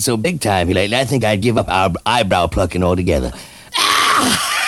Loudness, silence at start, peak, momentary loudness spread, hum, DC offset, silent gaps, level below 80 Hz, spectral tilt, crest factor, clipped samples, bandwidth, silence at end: -15 LUFS; 0 s; 0 dBFS; 6 LU; none; under 0.1%; none; -34 dBFS; -4 dB/octave; 16 dB; under 0.1%; 20 kHz; 0 s